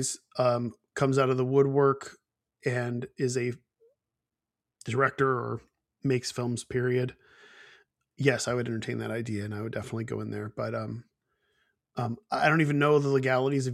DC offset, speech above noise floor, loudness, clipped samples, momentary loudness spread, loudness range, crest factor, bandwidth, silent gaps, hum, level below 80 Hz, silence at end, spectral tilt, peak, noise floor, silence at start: under 0.1%; 61 dB; -28 LUFS; under 0.1%; 12 LU; 7 LU; 22 dB; 13.5 kHz; none; none; -66 dBFS; 0 s; -5.5 dB/octave; -6 dBFS; -89 dBFS; 0 s